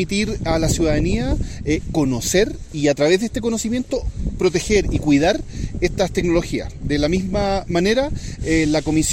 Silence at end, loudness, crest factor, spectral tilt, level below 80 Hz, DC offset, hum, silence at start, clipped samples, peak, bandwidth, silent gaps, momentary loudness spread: 0 s; -20 LUFS; 16 dB; -5 dB/octave; -30 dBFS; under 0.1%; none; 0 s; under 0.1%; -2 dBFS; 16 kHz; none; 8 LU